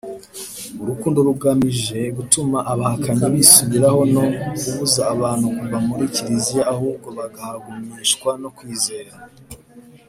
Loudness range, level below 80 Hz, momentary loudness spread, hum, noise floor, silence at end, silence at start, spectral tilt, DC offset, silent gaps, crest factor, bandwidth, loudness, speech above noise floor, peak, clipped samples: 8 LU; -52 dBFS; 17 LU; none; -45 dBFS; 0.3 s; 0.05 s; -4 dB/octave; under 0.1%; none; 20 dB; 16 kHz; -17 LUFS; 26 dB; 0 dBFS; under 0.1%